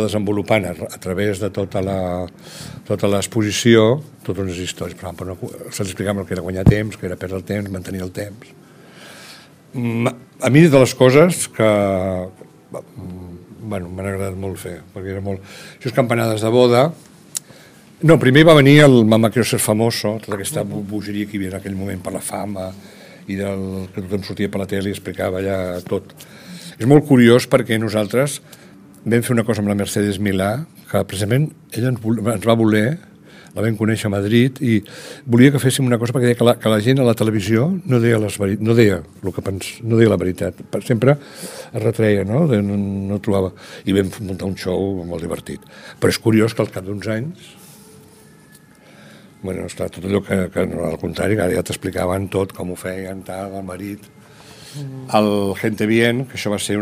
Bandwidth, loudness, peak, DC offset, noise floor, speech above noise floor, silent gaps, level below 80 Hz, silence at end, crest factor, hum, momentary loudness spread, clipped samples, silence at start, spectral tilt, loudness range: 16 kHz; -18 LUFS; 0 dBFS; under 0.1%; -47 dBFS; 29 dB; none; -46 dBFS; 0 s; 18 dB; none; 18 LU; under 0.1%; 0 s; -6 dB/octave; 11 LU